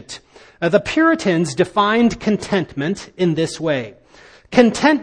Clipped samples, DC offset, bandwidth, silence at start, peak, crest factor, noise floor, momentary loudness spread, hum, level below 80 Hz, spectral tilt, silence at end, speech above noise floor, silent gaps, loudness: under 0.1%; under 0.1%; 10 kHz; 0.1 s; 0 dBFS; 18 dB; -46 dBFS; 9 LU; none; -48 dBFS; -5.5 dB/octave; 0 s; 30 dB; none; -17 LUFS